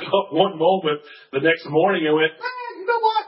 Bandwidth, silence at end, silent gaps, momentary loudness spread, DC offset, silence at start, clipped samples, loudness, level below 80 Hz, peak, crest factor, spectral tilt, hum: 5.8 kHz; 0 s; none; 11 LU; under 0.1%; 0 s; under 0.1%; -20 LUFS; -72 dBFS; -2 dBFS; 18 dB; -10 dB/octave; none